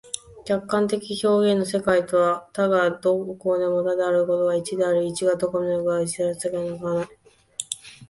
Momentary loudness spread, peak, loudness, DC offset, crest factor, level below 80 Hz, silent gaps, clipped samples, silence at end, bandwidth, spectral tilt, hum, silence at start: 9 LU; -6 dBFS; -23 LUFS; under 0.1%; 16 dB; -60 dBFS; none; under 0.1%; 0.05 s; 11.5 kHz; -5 dB/octave; none; 0.05 s